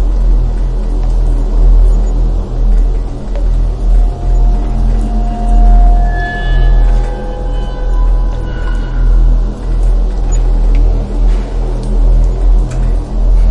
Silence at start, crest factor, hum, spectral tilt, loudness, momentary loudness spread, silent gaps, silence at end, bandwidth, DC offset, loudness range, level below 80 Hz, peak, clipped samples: 0 s; 8 dB; none; -7.5 dB/octave; -15 LUFS; 7 LU; none; 0 s; 7.2 kHz; under 0.1%; 2 LU; -10 dBFS; 0 dBFS; under 0.1%